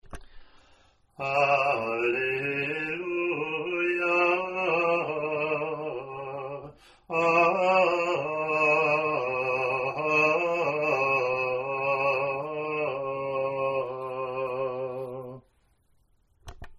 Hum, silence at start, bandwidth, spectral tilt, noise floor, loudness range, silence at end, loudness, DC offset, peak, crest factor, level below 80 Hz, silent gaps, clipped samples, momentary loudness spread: none; 0.1 s; 12.5 kHz; -5.5 dB/octave; -66 dBFS; 7 LU; 0.05 s; -26 LUFS; under 0.1%; -8 dBFS; 20 dB; -60 dBFS; none; under 0.1%; 12 LU